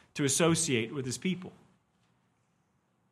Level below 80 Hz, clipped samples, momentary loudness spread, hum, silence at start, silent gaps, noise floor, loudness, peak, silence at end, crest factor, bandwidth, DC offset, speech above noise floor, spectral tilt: -68 dBFS; under 0.1%; 12 LU; none; 0.15 s; none; -74 dBFS; -30 LUFS; -12 dBFS; 1.6 s; 22 dB; 14.5 kHz; under 0.1%; 43 dB; -4 dB/octave